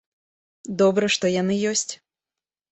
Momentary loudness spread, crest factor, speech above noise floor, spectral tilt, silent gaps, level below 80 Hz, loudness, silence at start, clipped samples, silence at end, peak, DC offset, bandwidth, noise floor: 17 LU; 16 dB; over 69 dB; -4 dB/octave; none; -64 dBFS; -22 LUFS; 0.65 s; under 0.1%; 0.75 s; -8 dBFS; under 0.1%; 8.4 kHz; under -90 dBFS